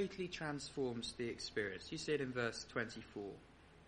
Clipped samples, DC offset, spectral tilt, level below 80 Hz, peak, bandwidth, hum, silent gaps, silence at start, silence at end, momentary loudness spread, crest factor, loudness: under 0.1%; under 0.1%; -4.5 dB/octave; -68 dBFS; -24 dBFS; 10.5 kHz; none; none; 0 s; 0 s; 9 LU; 20 dB; -43 LUFS